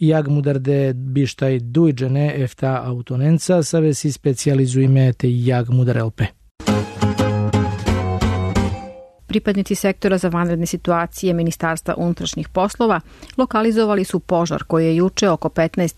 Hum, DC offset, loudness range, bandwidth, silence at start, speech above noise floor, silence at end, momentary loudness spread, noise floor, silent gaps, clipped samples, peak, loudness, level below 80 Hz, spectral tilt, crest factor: none; under 0.1%; 3 LU; 13.5 kHz; 0 s; 19 dB; 0.05 s; 6 LU; -37 dBFS; 6.51-6.55 s; under 0.1%; -6 dBFS; -19 LUFS; -38 dBFS; -6.5 dB/octave; 12 dB